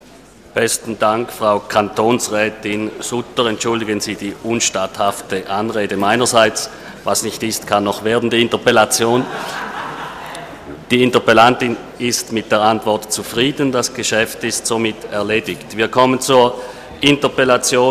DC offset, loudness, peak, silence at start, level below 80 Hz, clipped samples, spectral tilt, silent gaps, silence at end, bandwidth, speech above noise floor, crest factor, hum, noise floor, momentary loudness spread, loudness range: under 0.1%; -16 LUFS; 0 dBFS; 0.55 s; -50 dBFS; under 0.1%; -3 dB/octave; none; 0 s; 15.5 kHz; 26 dB; 16 dB; none; -42 dBFS; 12 LU; 3 LU